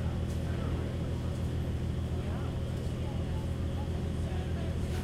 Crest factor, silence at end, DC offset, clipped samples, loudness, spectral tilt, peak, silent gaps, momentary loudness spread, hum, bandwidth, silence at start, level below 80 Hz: 12 dB; 0 s; under 0.1%; under 0.1%; -35 LUFS; -7.5 dB/octave; -20 dBFS; none; 1 LU; none; 13.5 kHz; 0 s; -38 dBFS